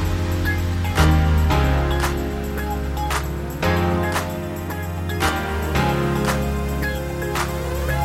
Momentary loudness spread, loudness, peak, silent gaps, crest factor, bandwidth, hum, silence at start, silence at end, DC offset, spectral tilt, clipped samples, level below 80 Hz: 8 LU; -22 LUFS; -4 dBFS; none; 16 dB; 16.5 kHz; none; 0 s; 0 s; under 0.1%; -5.5 dB/octave; under 0.1%; -26 dBFS